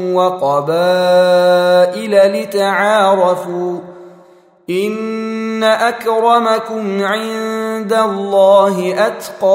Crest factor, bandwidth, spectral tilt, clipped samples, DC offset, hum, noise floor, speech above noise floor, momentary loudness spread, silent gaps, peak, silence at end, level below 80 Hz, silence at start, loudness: 12 dB; 16 kHz; -5 dB/octave; under 0.1%; under 0.1%; none; -45 dBFS; 32 dB; 9 LU; none; 0 dBFS; 0 s; -66 dBFS; 0 s; -13 LUFS